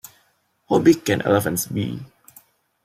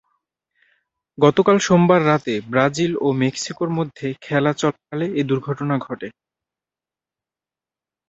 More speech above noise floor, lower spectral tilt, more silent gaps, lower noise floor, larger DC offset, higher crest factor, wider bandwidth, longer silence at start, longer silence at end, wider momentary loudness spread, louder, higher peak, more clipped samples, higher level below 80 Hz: second, 45 dB vs 71 dB; about the same, -5.5 dB/octave vs -6 dB/octave; neither; second, -64 dBFS vs -90 dBFS; neither; about the same, 20 dB vs 20 dB; first, 16 kHz vs 8 kHz; second, 0.7 s vs 1.2 s; second, 0.8 s vs 2 s; about the same, 11 LU vs 11 LU; about the same, -20 LUFS vs -19 LUFS; about the same, -4 dBFS vs -2 dBFS; neither; about the same, -58 dBFS vs -60 dBFS